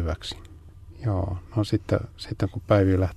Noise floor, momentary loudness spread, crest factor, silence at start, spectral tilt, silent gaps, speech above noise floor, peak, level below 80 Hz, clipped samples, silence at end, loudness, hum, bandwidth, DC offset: -45 dBFS; 14 LU; 18 dB; 0 s; -7.5 dB/octave; none; 20 dB; -8 dBFS; -44 dBFS; under 0.1%; 0 s; -26 LUFS; none; 12 kHz; under 0.1%